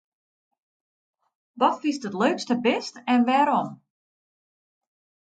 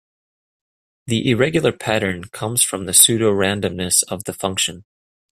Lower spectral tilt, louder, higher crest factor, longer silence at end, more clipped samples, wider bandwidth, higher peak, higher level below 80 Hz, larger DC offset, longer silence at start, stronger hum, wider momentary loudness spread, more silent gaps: first, -5 dB/octave vs -3 dB/octave; second, -23 LUFS vs -17 LUFS; about the same, 20 dB vs 20 dB; first, 1.55 s vs 0.55 s; neither; second, 9 kHz vs 15.5 kHz; second, -8 dBFS vs 0 dBFS; second, -80 dBFS vs -54 dBFS; neither; first, 1.55 s vs 1.05 s; neither; second, 8 LU vs 12 LU; neither